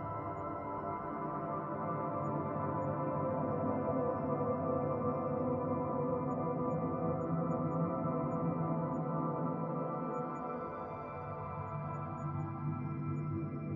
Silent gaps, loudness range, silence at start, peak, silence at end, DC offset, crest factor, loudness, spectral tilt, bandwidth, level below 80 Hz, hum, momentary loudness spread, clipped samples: none; 5 LU; 0 s; -22 dBFS; 0 s; under 0.1%; 14 dB; -37 LUFS; -10.5 dB/octave; 7.2 kHz; -66 dBFS; none; 6 LU; under 0.1%